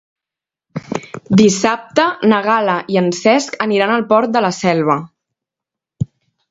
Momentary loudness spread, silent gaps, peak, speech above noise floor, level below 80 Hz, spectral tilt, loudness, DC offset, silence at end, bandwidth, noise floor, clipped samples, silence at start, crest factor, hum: 14 LU; none; 0 dBFS; 73 dB; -52 dBFS; -5 dB/octave; -15 LUFS; under 0.1%; 0.45 s; 8 kHz; -87 dBFS; under 0.1%; 0.75 s; 16 dB; none